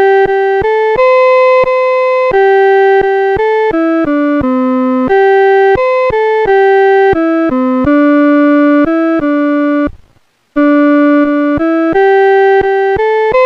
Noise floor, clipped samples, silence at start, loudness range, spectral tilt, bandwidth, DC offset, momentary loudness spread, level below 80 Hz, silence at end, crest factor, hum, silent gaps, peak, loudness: -51 dBFS; under 0.1%; 0 s; 2 LU; -7 dB/octave; 6 kHz; under 0.1%; 4 LU; -38 dBFS; 0 s; 8 dB; none; none; 0 dBFS; -9 LUFS